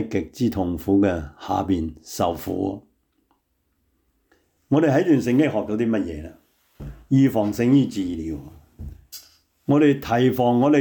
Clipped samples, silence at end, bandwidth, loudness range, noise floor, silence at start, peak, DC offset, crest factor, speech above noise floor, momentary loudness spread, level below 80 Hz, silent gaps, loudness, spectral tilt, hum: under 0.1%; 0 s; 19.5 kHz; 6 LU; -70 dBFS; 0 s; -8 dBFS; under 0.1%; 14 dB; 50 dB; 22 LU; -48 dBFS; none; -21 LUFS; -7 dB/octave; none